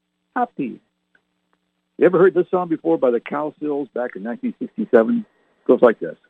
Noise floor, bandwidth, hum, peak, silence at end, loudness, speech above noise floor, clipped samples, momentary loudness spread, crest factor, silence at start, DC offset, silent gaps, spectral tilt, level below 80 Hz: -70 dBFS; 4 kHz; none; -2 dBFS; 0.15 s; -20 LUFS; 51 dB; under 0.1%; 12 LU; 20 dB; 0.35 s; under 0.1%; none; -9.5 dB/octave; -70 dBFS